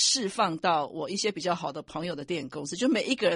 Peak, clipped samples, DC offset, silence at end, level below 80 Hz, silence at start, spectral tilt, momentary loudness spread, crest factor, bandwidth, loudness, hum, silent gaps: -12 dBFS; under 0.1%; under 0.1%; 0 s; -68 dBFS; 0 s; -3 dB/octave; 9 LU; 18 dB; 11.5 kHz; -29 LUFS; none; none